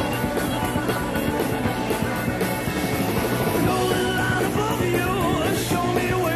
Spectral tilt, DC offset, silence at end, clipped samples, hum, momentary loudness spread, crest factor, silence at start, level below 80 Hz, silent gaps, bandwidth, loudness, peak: -5 dB/octave; under 0.1%; 0 s; under 0.1%; none; 3 LU; 14 dB; 0 s; -40 dBFS; none; 13.5 kHz; -23 LUFS; -8 dBFS